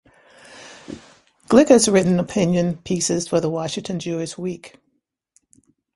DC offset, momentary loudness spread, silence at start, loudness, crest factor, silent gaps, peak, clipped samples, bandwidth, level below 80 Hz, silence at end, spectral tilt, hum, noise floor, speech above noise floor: under 0.1%; 25 LU; 0.5 s; -19 LUFS; 22 dB; none; 0 dBFS; under 0.1%; 11.5 kHz; -56 dBFS; 1.3 s; -5 dB/octave; none; -71 dBFS; 53 dB